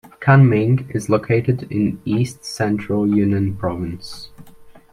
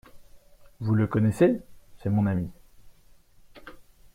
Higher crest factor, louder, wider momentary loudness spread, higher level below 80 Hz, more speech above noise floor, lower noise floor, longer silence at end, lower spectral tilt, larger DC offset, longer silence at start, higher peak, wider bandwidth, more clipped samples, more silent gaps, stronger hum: about the same, 16 dB vs 20 dB; first, -18 LUFS vs -26 LUFS; second, 14 LU vs 17 LU; about the same, -50 dBFS vs -54 dBFS; second, 25 dB vs 31 dB; second, -42 dBFS vs -55 dBFS; second, 0.15 s vs 0.35 s; second, -7.5 dB/octave vs -9 dB/octave; neither; about the same, 0.05 s vs 0.15 s; first, -2 dBFS vs -8 dBFS; second, 12.5 kHz vs 14 kHz; neither; neither; neither